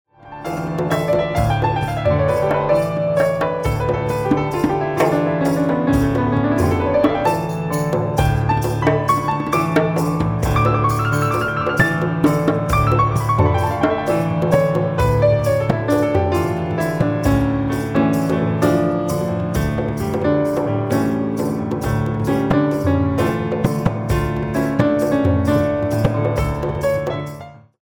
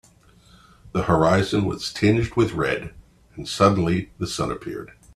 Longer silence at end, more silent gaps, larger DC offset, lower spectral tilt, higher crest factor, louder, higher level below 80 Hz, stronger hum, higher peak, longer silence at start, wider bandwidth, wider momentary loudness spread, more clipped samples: about the same, 0.25 s vs 0.3 s; neither; neither; first, -7.5 dB/octave vs -6 dB/octave; about the same, 16 dB vs 20 dB; first, -18 LUFS vs -22 LUFS; first, -34 dBFS vs -46 dBFS; neither; about the same, -2 dBFS vs -2 dBFS; second, 0.25 s vs 0.85 s; first, over 20 kHz vs 13.5 kHz; second, 4 LU vs 14 LU; neither